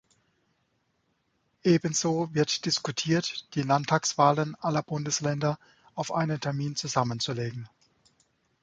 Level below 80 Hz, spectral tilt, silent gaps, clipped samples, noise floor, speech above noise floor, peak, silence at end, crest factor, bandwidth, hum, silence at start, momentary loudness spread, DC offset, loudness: -66 dBFS; -4.5 dB/octave; none; under 0.1%; -74 dBFS; 46 dB; -6 dBFS; 0.95 s; 22 dB; 9.4 kHz; none; 1.65 s; 9 LU; under 0.1%; -28 LUFS